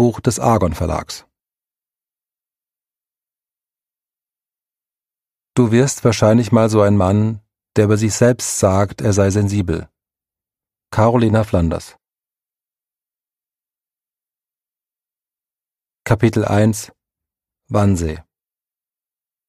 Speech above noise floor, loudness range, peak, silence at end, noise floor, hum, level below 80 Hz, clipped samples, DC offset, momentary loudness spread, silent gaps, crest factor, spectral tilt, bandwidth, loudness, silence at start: over 75 dB; 9 LU; 0 dBFS; 1.3 s; under -90 dBFS; none; -40 dBFS; under 0.1%; under 0.1%; 12 LU; none; 18 dB; -6.5 dB/octave; 15 kHz; -16 LUFS; 0 s